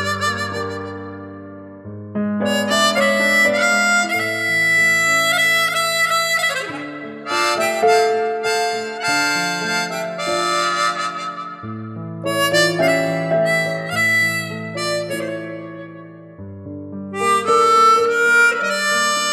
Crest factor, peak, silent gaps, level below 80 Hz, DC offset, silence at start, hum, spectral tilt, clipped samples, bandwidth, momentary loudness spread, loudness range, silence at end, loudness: 16 dB; -2 dBFS; none; -64 dBFS; under 0.1%; 0 s; none; -3 dB/octave; under 0.1%; 16.5 kHz; 18 LU; 6 LU; 0 s; -17 LUFS